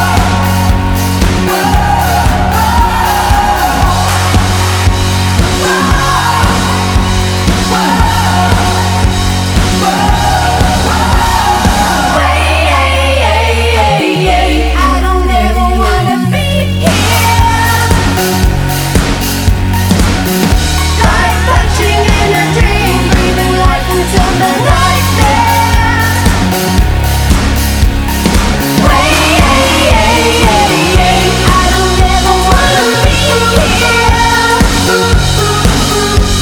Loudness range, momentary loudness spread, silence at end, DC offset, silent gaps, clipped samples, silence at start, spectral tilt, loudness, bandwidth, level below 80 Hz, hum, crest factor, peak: 2 LU; 3 LU; 0 s; under 0.1%; none; 0.5%; 0 s; -4.5 dB/octave; -9 LUFS; over 20 kHz; -14 dBFS; none; 8 dB; 0 dBFS